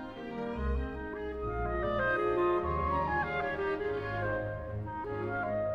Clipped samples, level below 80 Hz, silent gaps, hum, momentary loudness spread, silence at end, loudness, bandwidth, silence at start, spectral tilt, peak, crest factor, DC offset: under 0.1%; -44 dBFS; none; none; 9 LU; 0 s; -33 LUFS; 6.6 kHz; 0 s; -8.5 dB/octave; -20 dBFS; 14 dB; under 0.1%